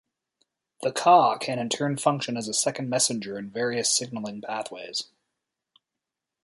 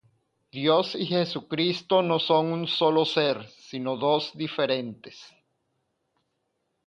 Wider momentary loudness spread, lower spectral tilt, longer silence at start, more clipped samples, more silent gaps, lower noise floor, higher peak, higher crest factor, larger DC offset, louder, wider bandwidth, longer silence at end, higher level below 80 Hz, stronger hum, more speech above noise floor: about the same, 14 LU vs 12 LU; second, -3 dB/octave vs -6 dB/octave; first, 0.8 s vs 0.55 s; neither; neither; first, -87 dBFS vs -77 dBFS; first, -4 dBFS vs -8 dBFS; about the same, 22 dB vs 20 dB; neither; about the same, -25 LUFS vs -25 LUFS; first, 12 kHz vs 8.4 kHz; second, 1.4 s vs 1.6 s; about the same, -74 dBFS vs -72 dBFS; neither; first, 61 dB vs 51 dB